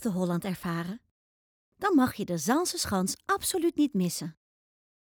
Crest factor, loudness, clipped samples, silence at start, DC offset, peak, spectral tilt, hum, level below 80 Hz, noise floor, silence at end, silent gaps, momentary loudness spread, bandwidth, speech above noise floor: 16 dB; -29 LUFS; under 0.1%; 0 s; under 0.1%; -14 dBFS; -4.5 dB/octave; none; -62 dBFS; under -90 dBFS; 0.7 s; 1.11-1.72 s; 10 LU; over 20 kHz; over 62 dB